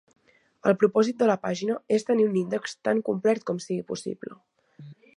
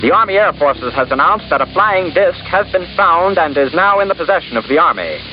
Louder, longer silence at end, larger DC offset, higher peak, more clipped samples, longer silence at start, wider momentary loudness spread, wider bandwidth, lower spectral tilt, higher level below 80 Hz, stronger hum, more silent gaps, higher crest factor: second, -26 LUFS vs -13 LUFS; first, 0.25 s vs 0 s; neither; second, -6 dBFS vs -2 dBFS; neither; first, 0.65 s vs 0 s; first, 11 LU vs 5 LU; first, 11 kHz vs 5.4 kHz; second, -6 dB/octave vs -8.5 dB/octave; second, -74 dBFS vs -42 dBFS; neither; neither; first, 20 dB vs 10 dB